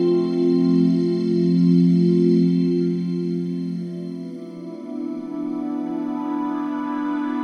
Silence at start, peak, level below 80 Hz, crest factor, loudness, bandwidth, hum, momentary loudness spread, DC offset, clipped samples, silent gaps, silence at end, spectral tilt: 0 s; -6 dBFS; -74 dBFS; 14 dB; -21 LUFS; 6.6 kHz; none; 14 LU; under 0.1%; under 0.1%; none; 0 s; -9.5 dB/octave